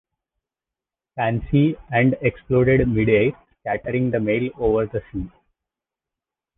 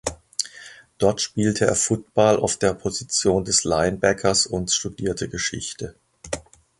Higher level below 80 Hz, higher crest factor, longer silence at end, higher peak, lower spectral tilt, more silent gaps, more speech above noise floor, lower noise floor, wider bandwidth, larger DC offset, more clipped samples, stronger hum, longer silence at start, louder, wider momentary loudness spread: about the same, -42 dBFS vs -46 dBFS; about the same, 18 dB vs 20 dB; first, 1.3 s vs 0.4 s; about the same, -4 dBFS vs -2 dBFS; first, -11 dB/octave vs -3.5 dB/octave; neither; first, 69 dB vs 23 dB; first, -89 dBFS vs -45 dBFS; second, 3.9 kHz vs 11.5 kHz; neither; neither; neither; first, 1.15 s vs 0.05 s; about the same, -21 LUFS vs -22 LUFS; about the same, 13 LU vs 14 LU